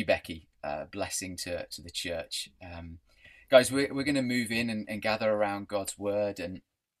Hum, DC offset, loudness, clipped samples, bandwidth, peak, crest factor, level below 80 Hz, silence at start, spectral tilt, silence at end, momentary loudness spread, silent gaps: none; under 0.1%; -30 LUFS; under 0.1%; 15 kHz; -6 dBFS; 26 dB; -60 dBFS; 0 s; -4 dB/octave; 0.4 s; 18 LU; none